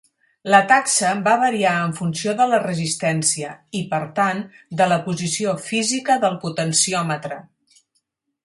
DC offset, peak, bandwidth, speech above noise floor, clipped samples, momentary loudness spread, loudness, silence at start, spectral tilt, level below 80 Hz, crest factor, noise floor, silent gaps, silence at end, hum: under 0.1%; 0 dBFS; 11.5 kHz; 52 dB; under 0.1%; 11 LU; -19 LUFS; 0.45 s; -3.5 dB/octave; -64 dBFS; 20 dB; -71 dBFS; none; 1.05 s; none